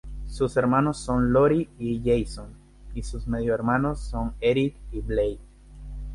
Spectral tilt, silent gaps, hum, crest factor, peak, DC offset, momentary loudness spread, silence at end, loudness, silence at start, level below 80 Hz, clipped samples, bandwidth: -7 dB/octave; none; 50 Hz at -40 dBFS; 16 dB; -8 dBFS; under 0.1%; 17 LU; 0 s; -25 LUFS; 0.05 s; -36 dBFS; under 0.1%; 11.5 kHz